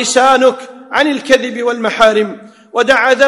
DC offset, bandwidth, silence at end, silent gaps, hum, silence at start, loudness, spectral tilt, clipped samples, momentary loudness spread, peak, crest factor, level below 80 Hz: under 0.1%; 12 kHz; 0 s; none; none; 0 s; -12 LUFS; -2.5 dB/octave; 1%; 10 LU; 0 dBFS; 12 dB; -50 dBFS